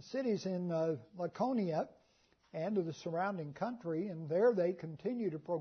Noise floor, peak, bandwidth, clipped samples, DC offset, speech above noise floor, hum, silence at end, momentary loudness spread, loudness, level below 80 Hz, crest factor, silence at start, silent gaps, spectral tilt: -72 dBFS; -20 dBFS; 6.4 kHz; under 0.1%; under 0.1%; 36 dB; none; 0 s; 10 LU; -37 LUFS; -80 dBFS; 16 dB; 0 s; none; -7 dB/octave